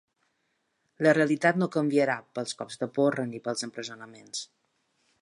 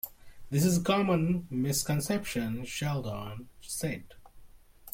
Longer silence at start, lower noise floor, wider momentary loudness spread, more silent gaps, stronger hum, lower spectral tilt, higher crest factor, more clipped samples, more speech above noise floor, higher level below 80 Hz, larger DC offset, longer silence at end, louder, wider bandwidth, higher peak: first, 1 s vs 0.05 s; first, -76 dBFS vs -52 dBFS; about the same, 15 LU vs 14 LU; neither; neither; about the same, -5 dB/octave vs -5 dB/octave; about the same, 20 dB vs 18 dB; neither; first, 49 dB vs 22 dB; second, -80 dBFS vs -54 dBFS; neither; first, 0.75 s vs 0 s; first, -27 LUFS vs -30 LUFS; second, 11.5 kHz vs 16.5 kHz; first, -8 dBFS vs -14 dBFS